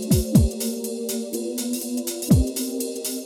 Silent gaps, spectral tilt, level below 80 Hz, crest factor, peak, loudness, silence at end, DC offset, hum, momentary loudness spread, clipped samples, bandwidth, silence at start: none; -5.5 dB/octave; -32 dBFS; 20 dB; -4 dBFS; -23 LUFS; 0 s; under 0.1%; none; 8 LU; under 0.1%; 17.5 kHz; 0 s